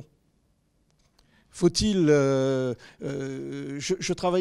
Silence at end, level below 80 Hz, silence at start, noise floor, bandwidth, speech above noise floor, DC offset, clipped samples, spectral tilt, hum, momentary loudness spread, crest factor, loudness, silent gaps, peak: 0 s; -50 dBFS; 1.55 s; -68 dBFS; 12.5 kHz; 43 dB; under 0.1%; under 0.1%; -5.5 dB/octave; none; 14 LU; 18 dB; -26 LUFS; none; -8 dBFS